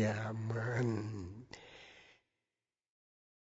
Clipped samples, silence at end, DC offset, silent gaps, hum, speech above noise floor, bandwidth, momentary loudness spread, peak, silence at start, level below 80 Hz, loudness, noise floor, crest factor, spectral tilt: under 0.1%; 1.45 s; under 0.1%; none; none; over 53 dB; 7.6 kHz; 20 LU; -24 dBFS; 0 s; -70 dBFS; -39 LUFS; under -90 dBFS; 18 dB; -6.5 dB/octave